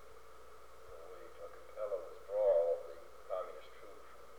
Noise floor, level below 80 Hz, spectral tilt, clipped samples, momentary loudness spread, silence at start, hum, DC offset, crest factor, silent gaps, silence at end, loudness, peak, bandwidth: -59 dBFS; -70 dBFS; -4.5 dB/octave; under 0.1%; 26 LU; 0 s; none; 0.2%; 20 dB; none; 0 s; -37 LUFS; -22 dBFS; 19 kHz